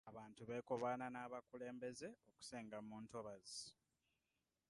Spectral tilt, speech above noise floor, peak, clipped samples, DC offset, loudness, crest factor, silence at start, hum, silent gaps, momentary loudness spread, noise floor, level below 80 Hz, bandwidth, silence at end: -4.5 dB/octave; over 39 dB; -32 dBFS; under 0.1%; under 0.1%; -51 LUFS; 20 dB; 0.05 s; none; none; 12 LU; under -90 dBFS; -86 dBFS; 11.5 kHz; 0.95 s